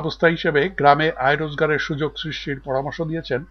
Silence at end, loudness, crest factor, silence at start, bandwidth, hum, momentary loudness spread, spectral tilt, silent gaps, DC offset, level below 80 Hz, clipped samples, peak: 0.05 s; -21 LUFS; 20 dB; 0 s; 6.6 kHz; none; 11 LU; -6.5 dB/octave; none; under 0.1%; -46 dBFS; under 0.1%; 0 dBFS